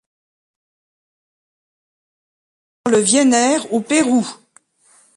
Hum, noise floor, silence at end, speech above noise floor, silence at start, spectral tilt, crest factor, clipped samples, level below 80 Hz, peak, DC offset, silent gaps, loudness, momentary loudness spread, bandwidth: none; -55 dBFS; 0.85 s; 40 dB; 2.85 s; -3 dB/octave; 18 dB; under 0.1%; -66 dBFS; -2 dBFS; under 0.1%; none; -15 LUFS; 8 LU; 11.5 kHz